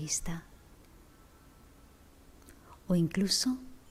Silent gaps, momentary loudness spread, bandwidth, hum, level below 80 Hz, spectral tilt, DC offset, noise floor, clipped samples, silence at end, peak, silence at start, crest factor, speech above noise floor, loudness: none; 21 LU; 16 kHz; none; -54 dBFS; -4 dB/octave; under 0.1%; -58 dBFS; under 0.1%; 0.1 s; -16 dBFS; 0 s; 20 dB; 27 dB; -31 LUFS